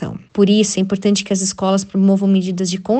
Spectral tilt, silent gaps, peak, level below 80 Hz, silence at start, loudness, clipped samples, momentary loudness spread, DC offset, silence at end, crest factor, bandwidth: -5.5 dB/octave; none; -2 dBFS; -54 dBFS; 0 s; -16 LUFS; under 0.1%; 6 LU; under 0.1%; 0 s; 14 dB; 9 kHz